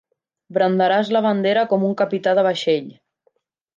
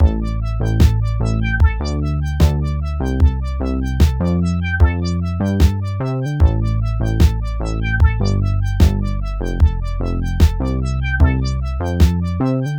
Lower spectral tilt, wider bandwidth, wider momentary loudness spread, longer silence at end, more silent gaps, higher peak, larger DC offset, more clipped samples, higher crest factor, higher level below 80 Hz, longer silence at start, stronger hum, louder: about the same, -6.5 dB/octave vs -7.5 dB/octave; second, 7.6 kHz vs 15.5 kHz; about the same, 5 LU vs 6 LU; first, 0.85 s vs 0 s; neither; second, -6 dBFS vs 0 dBFS; second, under 0.1% vs 0.1%; neither; about the same, 14 dB vs 16 dB; second, -74 dBFS vs -18 dBFS; first, 0.5 s vs 0 s; neither; about the same, -19 LUFS vs -18 LUFS